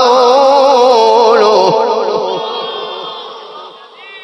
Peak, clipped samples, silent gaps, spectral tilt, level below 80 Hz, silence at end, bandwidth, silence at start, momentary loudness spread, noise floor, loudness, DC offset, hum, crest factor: 0 dBFS; 0.7%; none; -3.5 dB/octave; -62 dBFS; 0 s; 11 kHz; 0 s; 19 LU; -33 dBFS; -9 LUFS; under 0.1%; none; 10 dB